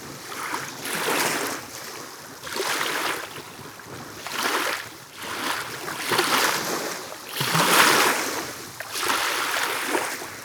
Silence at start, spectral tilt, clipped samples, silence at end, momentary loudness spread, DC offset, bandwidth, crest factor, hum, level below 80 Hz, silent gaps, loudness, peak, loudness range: 0 s; -1.5 dB/octave; under 0.1%; 0 s; 17 LU; under 0.1%; over 20 kHz; 26 dB; none; -66 dBFS; none; -24 LUFS; 0 dBFS; 7 LU